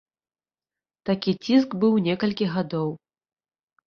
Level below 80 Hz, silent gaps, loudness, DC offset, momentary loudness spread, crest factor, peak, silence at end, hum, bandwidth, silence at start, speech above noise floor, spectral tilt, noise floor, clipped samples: -64 dBFS; none; -24 LUFS; under 0.1%; 10 LU; 18 dB; -8 dBFS; 0.9 s; none; 6.8 kHz; 1.05 s; over 67 dB; -7.5 dB/octave; under -90 dBFS; under 0.1%